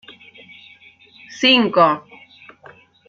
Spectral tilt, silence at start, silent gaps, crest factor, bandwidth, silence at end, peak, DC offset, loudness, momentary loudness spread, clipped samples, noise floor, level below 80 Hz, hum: -4 dB/octave; 1.3 s; none; 20 dB; 7.6 kHz; 1.1 s; -2 dBFS; under 0.1%; -15 LUFS; 15 LU; under 0.1%; -48 dBFS; -66 dBFS; none